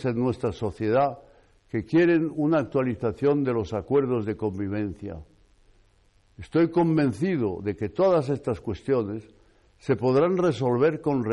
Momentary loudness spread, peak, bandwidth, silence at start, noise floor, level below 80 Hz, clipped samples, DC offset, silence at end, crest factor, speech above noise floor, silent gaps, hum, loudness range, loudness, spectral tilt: 11 LU; -14 dBFS; 11 kHz; 0 s; -61 dBFS; -56 dBFS; under 0.1%; under 0.1%; 0 s; 12 dB; 37 dB; none; none; 3 LU; -25 LUFS; -8.5 dB/octave